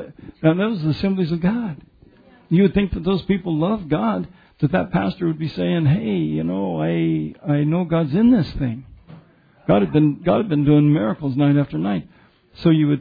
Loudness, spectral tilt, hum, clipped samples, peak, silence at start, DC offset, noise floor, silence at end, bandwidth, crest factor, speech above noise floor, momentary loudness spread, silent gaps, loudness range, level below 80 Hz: -20 LUFS; -10.5 dB/octave; none; under 0.1%; -2 dBFS; 0 s; under 0.1%; -50 dBFS; 0 s; 5 kHz; 18 dB; 31 dB; 8 LU; none; 3 LU; -44 dBFS